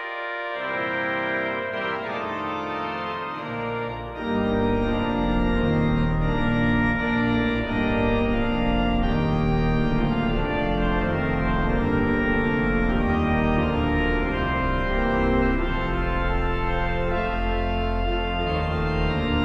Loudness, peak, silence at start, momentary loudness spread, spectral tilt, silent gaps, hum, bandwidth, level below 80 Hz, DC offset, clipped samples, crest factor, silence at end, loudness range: -24 LUFS; -8 dBFS; 0 s; 6 LU; -8.5 dB/octave; none; none; 6.6 kHz; -30 dBFS; under 0.1%; under 0.1%; 14 dB; 0 s; 4 LU